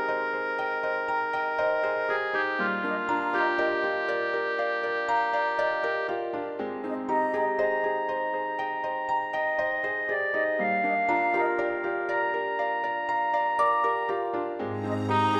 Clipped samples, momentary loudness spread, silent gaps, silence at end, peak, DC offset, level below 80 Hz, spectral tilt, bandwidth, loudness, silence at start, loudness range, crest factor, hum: under 0.1%; 5 LU; none; 0 s; -12 dBFS; under 0.1%; -70 dBFS; -6 dB/octave; 9.4 kHz; -27 LUFS; 0 s; 2 LU; 14 dB; none